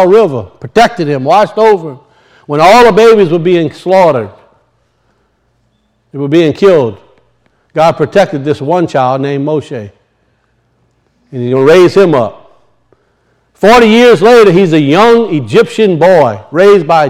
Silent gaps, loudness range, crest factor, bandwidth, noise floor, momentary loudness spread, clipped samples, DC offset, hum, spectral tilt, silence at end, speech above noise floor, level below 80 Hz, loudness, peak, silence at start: none; 8 LU; 8 dB; 15 kHz; -56 dBFS; 13 LU; 4%; under 0.1%; none; -6 dB/octave; 0 s; 49 dB; -44 dBFS; -7 LUFS; 0 dBFS; 0 s